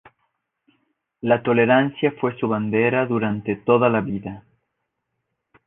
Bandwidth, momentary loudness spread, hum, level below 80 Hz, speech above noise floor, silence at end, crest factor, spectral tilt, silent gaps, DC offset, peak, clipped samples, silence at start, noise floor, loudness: 3.9 kHz; 12 LU; none; -58 dBFS; 57 dB; 1.25 s; 20 dB; -10.5 dB/octave; none; under 0.1%; -4 dBFS; under 0.1%; 1.25 s; -77 dBFS; -20 LUFS